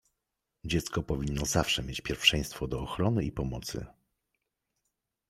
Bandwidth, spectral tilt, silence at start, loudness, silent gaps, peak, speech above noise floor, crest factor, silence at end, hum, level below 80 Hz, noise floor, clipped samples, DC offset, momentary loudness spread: 16 kHz; -4 dB/octave; 0.65 s; -30 LUFS; none; -6 dBFS; 54 dB; 26 dB; 1.4 s; none; -46 dBFS; -85 dBFS; under 0.1%; under 0.1%; 13 LU